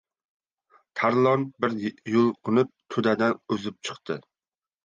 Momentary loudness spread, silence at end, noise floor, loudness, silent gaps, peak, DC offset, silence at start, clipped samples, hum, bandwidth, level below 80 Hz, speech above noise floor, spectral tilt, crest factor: 13 LU; 0.65 s; under -90 dBFS; -25 LUFS; none; -8 dBFS; under 0.1%; 0.95 s; under 0.1%; none; 9 kHz; -70 dBFS; over 65 dB; -6.5 dB/octave; 18 dB